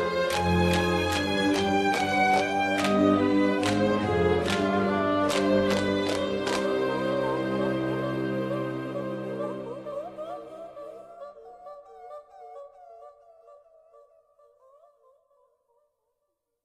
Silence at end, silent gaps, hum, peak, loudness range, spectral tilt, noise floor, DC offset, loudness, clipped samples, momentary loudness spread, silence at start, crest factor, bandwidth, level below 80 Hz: 3.1 s; none; none; -10 dBFS; 19 LU; -5.5 dB/octave; -80 dBFS; under 0.1%; -26 LUFS; under 0.1%; 22 LU; 0 s; 18 dB; 14 kHz; -52 dBFS